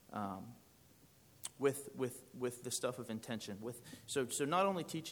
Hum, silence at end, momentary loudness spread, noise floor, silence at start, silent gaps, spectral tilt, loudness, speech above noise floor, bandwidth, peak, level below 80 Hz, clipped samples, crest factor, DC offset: none; 0 s; 15 LU; -66 dBFS; 0.1 s; none; -4 dB/octave; -40 LUFS; 26 dB; over 20 kHz; -22 dBFS; -80 dBFS; under 0.1%; 20 dB; under 0.1%